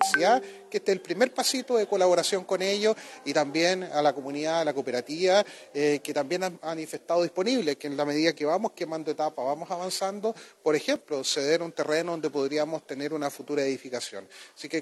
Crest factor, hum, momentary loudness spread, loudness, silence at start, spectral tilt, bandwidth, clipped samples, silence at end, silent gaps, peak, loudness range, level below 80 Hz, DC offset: 20 dB; none; 10 LU; -27 LUFS; 0 s; -3.5 dB/octave; 13 kHz; under 0.1%; 0 s; none; -8 dBFS; 3 LU; -86 dBFS; under 0.1%